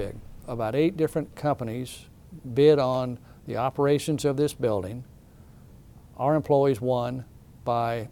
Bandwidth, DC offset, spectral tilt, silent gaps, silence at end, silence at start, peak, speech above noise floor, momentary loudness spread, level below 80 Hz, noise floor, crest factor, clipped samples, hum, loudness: 17 kHz; under 0.1%; -7 dB/octave; none; 0 s; 0 s; -8 dBFS; 25 dB; 16 LU; -52 dBFS; -50 dBFS; 18 dB; under 0.1%; none; -26 LUFS